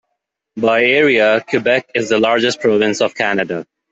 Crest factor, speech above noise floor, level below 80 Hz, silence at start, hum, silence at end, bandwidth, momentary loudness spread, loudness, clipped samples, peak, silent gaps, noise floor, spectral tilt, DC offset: 14 dB; 60 dB; -60 dBFS; 0.55 s; none; 0.3 s; 8 kHz; 8 LU; -14 LUFS; under 0.1%; -2 dBFS; none; -75 dBFS; -4 dB/octave; under 0.1%